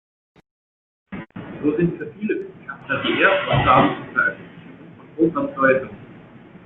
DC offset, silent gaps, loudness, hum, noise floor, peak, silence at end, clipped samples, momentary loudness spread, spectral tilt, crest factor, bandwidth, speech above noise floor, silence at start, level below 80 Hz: under 0.1%; none; -20 LUFS; none; -44 dBFS; -2 dBFS; 0.45 s; under 0.1%; 21 LU; -9.5 dB/octave; 22 dB; 4.1 kHz; 25 dB; 1.1 s; -48 dBFS